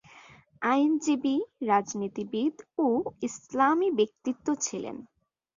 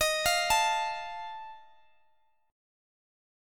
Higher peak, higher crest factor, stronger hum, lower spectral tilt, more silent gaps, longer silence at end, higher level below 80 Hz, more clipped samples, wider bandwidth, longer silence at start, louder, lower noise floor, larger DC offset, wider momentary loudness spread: about the same, -10 dBFS vs -12 dBFS; about the same, 18 dB vs 20 dB; neither; first, -4 dB/octave vs 0.5 dB/octave; neither; second, 0.55 s vs 1.85 s; second, -72 dBFS vs -56 dBFS; neither; second, 7.6 kHz vs 17.5 kHz; first, 0.15 s vs 0 s; about the same, -28 LUFS vs -28 LUFS; second, -54 dBFS vs -72 dBFS; neither; second, 10 LU vs 19 LU